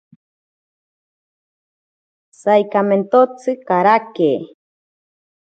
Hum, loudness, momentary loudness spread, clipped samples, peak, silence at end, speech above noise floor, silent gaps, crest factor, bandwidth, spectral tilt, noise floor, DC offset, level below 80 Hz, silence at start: none; -16 LUFS; 9 LU; under 0.1%; 0 dBFS; 1.1 s; over 75 dB; none; 20 dB; 9 kHz; -7 dB/octave; under -90 dBFS; under 0.1%; -74 dBFS; 2.45 s